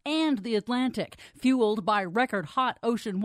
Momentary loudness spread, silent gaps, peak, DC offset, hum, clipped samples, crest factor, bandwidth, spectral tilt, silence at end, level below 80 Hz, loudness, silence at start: 5 LU; none; -12 dBFS; under 0.1%; none; under 0.1%; 16 dB; 13.5 kHz; -5.5 dB/octave; 0 s; -66 dBFS; -27 LUFS; 0.05 s